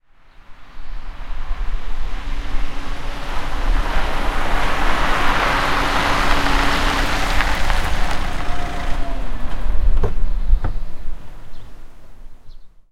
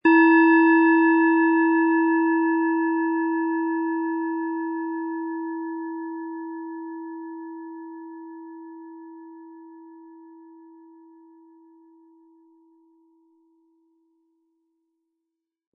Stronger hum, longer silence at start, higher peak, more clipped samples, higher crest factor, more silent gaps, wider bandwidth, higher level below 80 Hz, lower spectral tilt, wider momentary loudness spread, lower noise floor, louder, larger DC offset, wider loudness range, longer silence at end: neither; first, 0.4 s vs 0.05 s; first, 0 dBFS vs -6 dBFS; neither; about the same, 16 dB vs 18 dB; neither; first, 12.5 kHz vs 4.7 kHz; first, -20 dBFS vs under -90 dBFS; second, -4 dB/octave vs -7.5 dB/octave; second, 18 LU vs 25 LU; second, -43 dBFS vs -83 dBFS; about the same, -22 LUFS vs -21 LUFS; neither; second, 10 LU vs 24 LU; second, 0.25 s vs 5.6 s